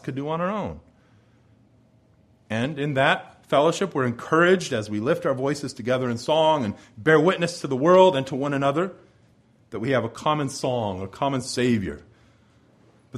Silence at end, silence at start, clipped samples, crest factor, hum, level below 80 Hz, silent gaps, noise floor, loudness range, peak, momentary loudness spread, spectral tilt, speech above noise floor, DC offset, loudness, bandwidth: 0 s; 0.05 s; under 0.1%; 22 dB; none; -58 dBFS; none; -58 dBFS; 6 LU; -2 dBFS; 11 LU; -5.5 dB/octave; 36 dB; under 0.1%; -23 LUFS; 13 kHz